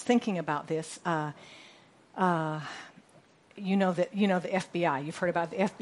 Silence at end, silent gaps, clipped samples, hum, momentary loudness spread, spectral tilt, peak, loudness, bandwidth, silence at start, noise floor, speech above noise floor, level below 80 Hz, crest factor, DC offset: 0.05 s; none; under 0.1%; none; 18 LU; -6 dB/octave; -12 dBFS; -30 LUFS; 11.5 kHz; 0 s; -60 dBFS; 31 dB; -76 dBFS; 20 dB; under 0.1%